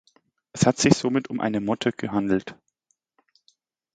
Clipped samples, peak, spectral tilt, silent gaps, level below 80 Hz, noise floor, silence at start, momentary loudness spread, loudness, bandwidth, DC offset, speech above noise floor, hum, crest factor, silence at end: under 0.1%; 0 dBFS; -5 dB/octave; none; -56 dBFS; -73 dBFS; 0.55 s; 7 LU; -23 LUFS; 9.4 kHz; under 0.1%; 50 dB; none; 26 dB; 1.4 s